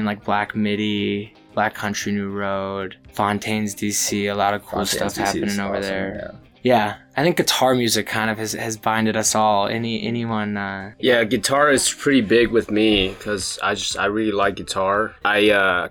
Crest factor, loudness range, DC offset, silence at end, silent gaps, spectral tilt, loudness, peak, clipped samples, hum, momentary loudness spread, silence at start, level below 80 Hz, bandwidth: 16 dB; 5 LU; under 0.1%; 0 s; none; -3.5 dB/octave; -20 LUFS; -4 dBFS; under 0.1%; none; 8 LU; 0 s; -48 dBFS; 18 kHz